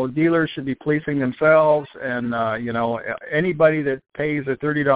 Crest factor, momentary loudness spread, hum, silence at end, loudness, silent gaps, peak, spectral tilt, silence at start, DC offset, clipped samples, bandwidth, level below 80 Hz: 16 dB; 10 LU; none; 0 s; -21 LUFS; none; -4 dBFS; -10.5 dB/octave; 0 s; under 0.1%; under 0.1%; 4 kHz; -56 dBFS